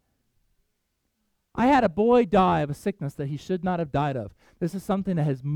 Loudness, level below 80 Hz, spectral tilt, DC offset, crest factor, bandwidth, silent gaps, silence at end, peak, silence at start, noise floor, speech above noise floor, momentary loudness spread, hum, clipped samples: -24 LUFS; -50 dBFS; -7.5 dB/octave; under 0.1%; 16 dB; 14.5 kHz; none; 0 s; -8 dBFS; 1.55 s; -76 dBFS; 52 dB; 12 LU; none; under 0.1%